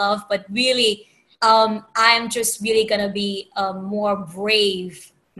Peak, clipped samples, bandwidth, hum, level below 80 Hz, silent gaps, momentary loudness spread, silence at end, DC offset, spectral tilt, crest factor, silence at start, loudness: 0 dBFS; under 0.1%; 13.5 kHz; none; -60 dBFS; none; 10 LU; 0.35 s; under 0.1%; -2.5 dB/octave; 20 dB; 0 s; -19 LUFS